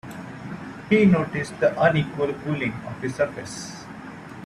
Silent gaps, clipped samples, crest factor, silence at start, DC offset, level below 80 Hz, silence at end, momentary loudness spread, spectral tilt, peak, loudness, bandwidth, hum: none; under 0.1%; 18 dB; 0.05 s; under 0.1%; -56 dBFS; 0 s; 18 LU; -6.5 dB/octave; -6 dBFS; -23 LUFS; 12.5 kHz; none